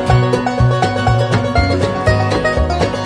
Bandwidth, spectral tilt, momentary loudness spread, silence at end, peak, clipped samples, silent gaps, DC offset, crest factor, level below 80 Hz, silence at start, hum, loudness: 10.5 kHz; -6.5 dB/octave; 2 LU; 0 s; 0 dBFS; under 0.1%; none; under 0.1%; 14 dB; -24 dBFS; 0 s; none; -15 LUFS